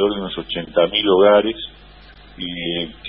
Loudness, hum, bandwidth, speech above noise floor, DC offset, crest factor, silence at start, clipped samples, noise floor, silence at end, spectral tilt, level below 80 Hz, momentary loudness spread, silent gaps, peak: -18 LUFS; none; 5.2 kHz; 25 dB; 0.1%; 18 dB; 0 s; under 0.1%; -43 dBFS; 0 s; -10 dB/octave; -46 dBFS; 17 LU; none; -2 dBFS